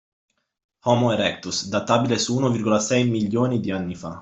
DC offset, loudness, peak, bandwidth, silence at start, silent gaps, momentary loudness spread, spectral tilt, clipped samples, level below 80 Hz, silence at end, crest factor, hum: under 0.1%; -22 LUFS; -4 dBFS; 8.2 kHz; 0.85 s; none; 8 LU; -5 dB/octave; under 0.1%; -60 dBFS; 0 s; 20 dB; none